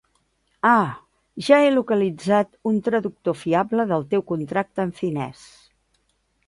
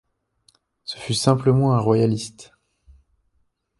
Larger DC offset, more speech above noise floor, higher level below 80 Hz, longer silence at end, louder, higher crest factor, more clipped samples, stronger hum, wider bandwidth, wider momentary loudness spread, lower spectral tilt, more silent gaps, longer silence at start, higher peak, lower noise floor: neither; about the same, 47 dB vs 49 dB; second, -62 dBFS vs -54 dBFS; second, 1.15 s vs 1.35 s; about the same, -21 LUFS vs -20 LUFS; about the same, 20 dB vs 20 dB; neither; neither; about the same, 11.5 kHz vs 11.5 kHz; second, 11 LU vs 17 LU; about the same, -6.5 dB/octave vs -6.5 dB/octave; neither; second, 0.65 s vs 0.9 s; about the same, -2 dBFS vs -4 dBFS; about the same, -68 dBFS vs -68 dBFS